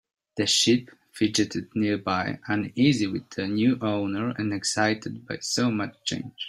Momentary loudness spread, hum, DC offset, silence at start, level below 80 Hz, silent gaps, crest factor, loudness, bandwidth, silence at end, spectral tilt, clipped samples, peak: 9 LU; none; under 0.1%; 0.35 s; -64 dBFS; none; 18 dB; -25 LUFS; 14.5 kHz; 0 s; -4 dB/octave; under 0.1%; -8 dBFS